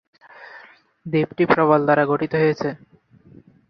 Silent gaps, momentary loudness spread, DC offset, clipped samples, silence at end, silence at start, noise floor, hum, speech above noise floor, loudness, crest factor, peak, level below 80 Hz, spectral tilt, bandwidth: none; 25 LU; under 0.1%; under 0.1%; 0.95 s; 0.4 s; -50 dBFS; none; 31 dB; -19 LUFS; 20 dB; -2 dBFS; -60 dBFS; -8 dB/octave; 6.2 kHz